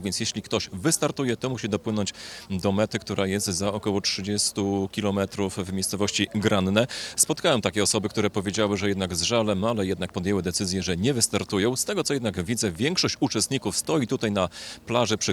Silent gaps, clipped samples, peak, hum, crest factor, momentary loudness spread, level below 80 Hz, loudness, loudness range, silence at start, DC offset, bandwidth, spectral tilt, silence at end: none; under 0.1%; -6 dBFS; none; 20 dB; 6 LU; -58 dBFS; -25 LUFS; 3 LU; 0 s; under 0.1%; 17.5 kHz; -4 dB/octave; 0 s